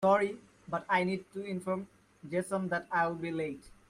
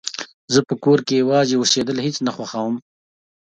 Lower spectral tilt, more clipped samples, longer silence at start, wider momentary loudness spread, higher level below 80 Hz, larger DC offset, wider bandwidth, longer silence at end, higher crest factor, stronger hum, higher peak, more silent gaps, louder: first, -6 dB/octave vs -4 dB/octave; neither; about the same, 0 s vs 0.05 s; about the same, 10 LU vs 10 LU; second, -68 dBFS vs -62 dBFS; neither; first, 14.5 kHz vs 9.4 kHz; second, 0.2 s vs 0.7 s; about the same, 18 dB vs 18 dB; neither; second, -14 dBFS vs -2 dBFS; second, none vs 0.34-0.48 s; second, -34 LUFS vs -19 LUFS